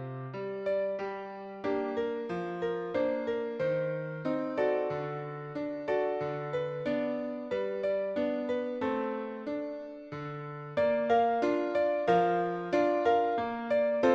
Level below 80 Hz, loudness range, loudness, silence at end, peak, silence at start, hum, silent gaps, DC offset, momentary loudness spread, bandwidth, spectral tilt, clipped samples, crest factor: -68 dBFS; 5 LU; -32 LUFS; 0 s; -14 dBFS; 0 s; none; none; under 0.1%; 12 LU; 7.4 kHz; -7.5 dB/octave; under 0.1%; 18 dB